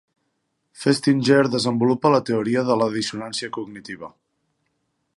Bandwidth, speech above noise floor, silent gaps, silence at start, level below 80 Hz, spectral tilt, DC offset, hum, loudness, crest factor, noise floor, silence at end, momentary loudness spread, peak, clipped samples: 11.5 kHz; 53 dB; none; 0.8 s; -66 dBFS; -5.5 dB/octave; under 0.1%; none; -20 LUFS; 20 dB; -73 dBFS; 1.1 s; 17 LU; -4 dBFS; under 0.1%